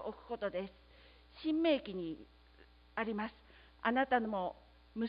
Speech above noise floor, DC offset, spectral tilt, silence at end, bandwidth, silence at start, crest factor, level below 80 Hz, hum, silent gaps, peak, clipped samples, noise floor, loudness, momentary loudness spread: 26 dB; under 0.1%; -3 dB/octave; 0 s; 5 kHz; 0 s; 20 dB; -64 dBFS; none; none; -18 dBFS; under 0.1%; -63 dBFS; -37 LUFS; 13 LU